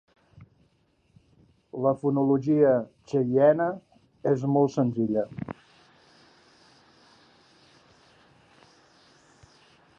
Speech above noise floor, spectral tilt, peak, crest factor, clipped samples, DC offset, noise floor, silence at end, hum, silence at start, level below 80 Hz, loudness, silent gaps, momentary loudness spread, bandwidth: 44 dB; -9 dB/octave; -8 dBFS; 20 dB; under 0.1%; under 0.1%; -67 dBFS; 4.45 s; none; 0.4 s; -68 dBFS; -25 LUFS; none; 18 LU; 7.4 kHz